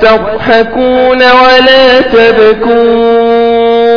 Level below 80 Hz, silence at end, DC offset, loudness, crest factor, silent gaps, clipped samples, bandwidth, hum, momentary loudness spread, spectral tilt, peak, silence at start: -32 dBFS; 0 s; under 0.1%; -5 LUFS; 4 dB; none; 6%; 5.4 kHz; none; 5 LU; -5 dB/octave; 0 dBFS; 0 s